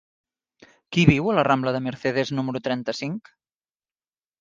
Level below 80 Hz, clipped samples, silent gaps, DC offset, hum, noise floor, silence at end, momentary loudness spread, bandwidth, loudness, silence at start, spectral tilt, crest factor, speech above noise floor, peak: -50 dBFS; under 0.1%; none; under 0.1%; none; under -90 dBFS; 1.2 s; 11 LU; 7.6 kHz; -23 LUFS; 0.9 s; -6.5 dB/octave; 24 dB; over 68 dB; 0 dBFS